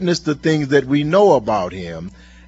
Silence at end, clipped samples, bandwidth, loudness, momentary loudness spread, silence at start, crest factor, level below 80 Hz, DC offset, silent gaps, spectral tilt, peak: 0.4 s; under 0.1%; 8 kHz; -16 LUFS; 17 LU; 0 s; 16 dB; -46 dBFS; under 0.1%; none; -6 dB/octave; 0 dBFS